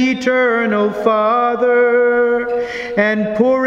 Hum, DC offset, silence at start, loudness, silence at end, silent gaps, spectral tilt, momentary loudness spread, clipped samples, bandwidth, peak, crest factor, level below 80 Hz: none; under 0.1%; 0 s; -15 LUFS; 0 s; none; -6 dB/octave; 5 LU; under 0.1%; 7.4 kHz; 0 dBFS; 14 dB; -52 dBFS